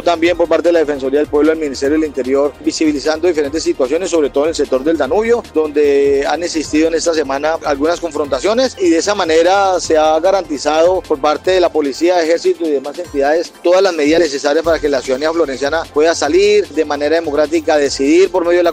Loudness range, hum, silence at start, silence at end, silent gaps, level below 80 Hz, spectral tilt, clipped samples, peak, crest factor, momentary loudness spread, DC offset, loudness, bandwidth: 2 LU; none; 0 s; 0 s; none; -42 dBFS; -3.5 dB/octave; under 0.1%; 0 dBFS; 12 dB; 5 LU; under 0.1%; -14 LUFS; 15 kHz